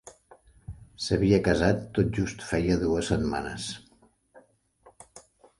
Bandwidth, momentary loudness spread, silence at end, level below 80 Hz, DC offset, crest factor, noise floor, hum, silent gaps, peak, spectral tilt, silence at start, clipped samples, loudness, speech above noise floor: 11.5 kHz; 22 LU; 0.4 s; -44 dBFS; under 0.1%; 20 dB; -62 dBFS; none; none; -8 dBFS; -6 dB/octave; 0.05 s; under 0.1%; -27 LUFS; 37 dB